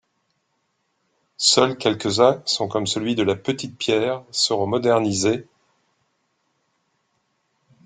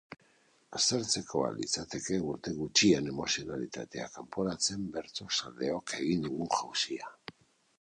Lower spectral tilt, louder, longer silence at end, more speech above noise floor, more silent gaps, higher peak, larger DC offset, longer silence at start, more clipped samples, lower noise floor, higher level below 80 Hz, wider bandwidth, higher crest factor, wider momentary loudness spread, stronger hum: about the same, -3.5 dB/octave vs -3 dB/octave; first, -20 LUFS vs -32 LUFS; first, 2.45 s vs 0.5 s; first, 51 dB vs 34 dB; neither; first, -2 dBFS vs -10 dBFS; neither; first, 1.4 s vs 0.1 s; neither; first, -71 dBFS vs -67 dBFS; about the same, -62 dBFS vs -64 dBFS; second, 9.6 kHz vs 11 kHz; about the same, 22 dB vs 24 dB; second, 7 LU vs 13 LU; neither